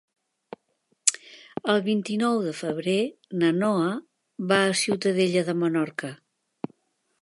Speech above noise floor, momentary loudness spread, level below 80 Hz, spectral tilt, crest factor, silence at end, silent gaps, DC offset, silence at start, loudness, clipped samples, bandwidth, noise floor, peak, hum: 48 dB; 16 LU; -74 dBFS; -4 dB/octave; 26 dB; 1.05 s; none; under 0.1%; 1.05 s; -25 LUFS; under 0.1%; 11.5 kHz; -72 dBFS; 0 dBFS; none